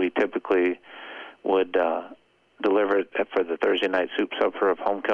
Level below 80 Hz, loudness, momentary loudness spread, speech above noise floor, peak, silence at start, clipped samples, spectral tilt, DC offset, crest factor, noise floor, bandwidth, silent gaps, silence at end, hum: -70 dBFS; -25 LUFS; 12 LU; 25 dB; -10 dBFS; 0 s; under 0.1%; -5.5 dB/octave; under 0.1%; 16 dB; -49 dBFS; 7 kHz; none; 0 s; none